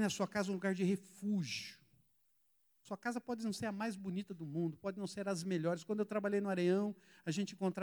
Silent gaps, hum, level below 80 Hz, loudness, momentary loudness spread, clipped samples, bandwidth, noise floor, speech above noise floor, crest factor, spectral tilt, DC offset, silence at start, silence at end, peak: none; none; -82 dBFS; -39 LUFS; 8 LU; under 0.1%; over 20 kHz; -76 dBFS; 38 dB; 16 dB; -5.5 dB/octave; under 0.1%; 0 s; 0 s; -22 dBFS